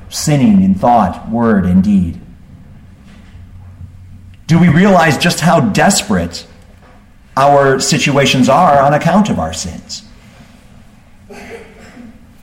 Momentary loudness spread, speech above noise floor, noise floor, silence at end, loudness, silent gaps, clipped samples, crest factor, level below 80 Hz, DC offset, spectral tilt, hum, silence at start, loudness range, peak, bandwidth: 19 LU; 31 dB; -41 dBFS; 0.35 s; -11 LUFS; none; under 0.1%; 12 dB; -38 dBFS; under 0.1%; -5 dB/octave; none; 0 s; 6 LU; 0 dBFS; 16.5 kHz